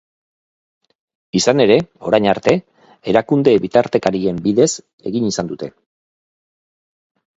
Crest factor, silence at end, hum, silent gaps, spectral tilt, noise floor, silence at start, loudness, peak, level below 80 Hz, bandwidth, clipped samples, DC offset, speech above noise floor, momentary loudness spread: 18 dB; 1.65 s; none; 4.93-4.98 s; -5 dB/octave; under -90 dBFS; 1.35 s; -16 LUFS; 0 dBFS; -54 dBFS; 8 kHz; under 0.1%; under 0.1%; over 75 dB; 12 LU